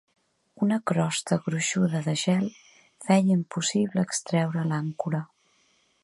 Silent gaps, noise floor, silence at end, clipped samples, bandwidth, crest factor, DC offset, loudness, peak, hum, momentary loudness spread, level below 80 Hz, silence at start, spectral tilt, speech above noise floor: none; -66 dBFS; 0.8 s; under 0.1%; 11.5 kHz; 18 dB; under 0.1%; -26 LUFS; -8 dBFS; none; 7 LU; -70 dBFS; 0.6 s; -5 dB/octave; 41 dB